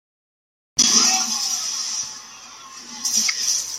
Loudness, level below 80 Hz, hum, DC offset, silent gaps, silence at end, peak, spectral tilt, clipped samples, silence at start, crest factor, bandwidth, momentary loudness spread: -18 LUFS; -64 dBFS; none; under 0.1%; none; 0 s; -2 dBFS; 1.5 dB/octave; under 0.1%; 0.75 s; 22 dB; 16.5 kHz; 23 LU